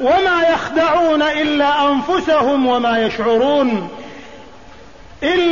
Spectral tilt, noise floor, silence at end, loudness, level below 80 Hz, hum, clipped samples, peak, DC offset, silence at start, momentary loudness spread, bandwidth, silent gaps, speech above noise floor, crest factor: -5 dB/octave; -40 dBFS; 0 s; -15 LUFS; -46 dBFS; none; under 0.1%; -6 dBFS; 0.8%; 0 s; 9 LU; 7.4 kHz; none; 26 dB; 10 dB